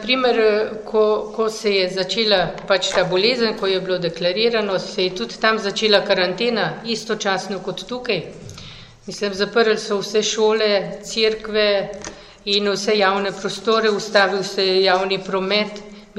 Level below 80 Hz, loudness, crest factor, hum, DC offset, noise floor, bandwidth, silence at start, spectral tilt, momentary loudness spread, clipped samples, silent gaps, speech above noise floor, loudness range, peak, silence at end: -52 dBFS; -19 LUFS; 20 dB; none; under 0.1%; -39 dBFS; 12 kHz; 0 s; -3.5 dB/octave; 11 LU; under 0.1%; none; 20 dB; 4 LU; 0 dBFS; 0 s